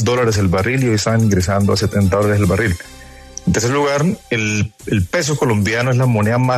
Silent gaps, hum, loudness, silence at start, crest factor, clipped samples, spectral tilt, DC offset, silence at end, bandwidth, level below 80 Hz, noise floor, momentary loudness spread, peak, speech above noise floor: none; none; -16 LUFS; 0 s; 12 dB; under 0.1%; -5.5 dB/octave; under 0.1%; 0 s; 13.5 kHz; -38 dBFS; -35 dBFS; 5 LU; -4 dBFS; 20 dB